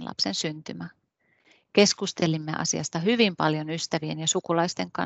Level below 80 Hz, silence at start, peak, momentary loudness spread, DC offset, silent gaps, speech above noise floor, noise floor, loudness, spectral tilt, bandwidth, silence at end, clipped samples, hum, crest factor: -68 dBFS; 0 s; -4 dBFS; 11 LU; under 0.1%; none; 41 dB; -67 dBFS; -25 LUFS; -3.5 dB/octave; 8.4 kHz; 0 s; under 0.1%; none; 22 dB